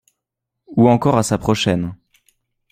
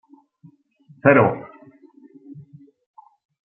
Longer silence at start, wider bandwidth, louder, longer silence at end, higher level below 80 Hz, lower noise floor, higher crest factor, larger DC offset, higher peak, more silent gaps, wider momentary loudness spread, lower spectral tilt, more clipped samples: second, 0.7 s vs 1.05 s; first, 15.5 kHz vs 3.6 kHz; about the same, -17 LUFS vs -17 LUFS; second, 0.8 s vs 1.05 s; first, -46 dBFS vs -64 dBFS; first, -81 dBFS vs -54 dBFS; about the same, 18 dB vs 22 dB; neither; about the same, -2 dBFS vs -2 dBFS; neither; second, 10 LU vs 29 LU; second, -6 dB/octave vs -11.5 dB/octave; neither